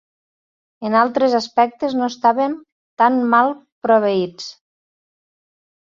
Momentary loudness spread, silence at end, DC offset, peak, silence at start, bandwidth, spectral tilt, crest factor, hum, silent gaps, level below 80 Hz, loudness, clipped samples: 12 LU; 1.4 s; under 0.1%; -2 dBFS; 0.8 s; 7.6 kHz; -5.5 dB/octave; 18 dB; none; 2.72-2.97 s, 3.72-3.81 s; -66 dBFS; -17 LUFS; under 0.1%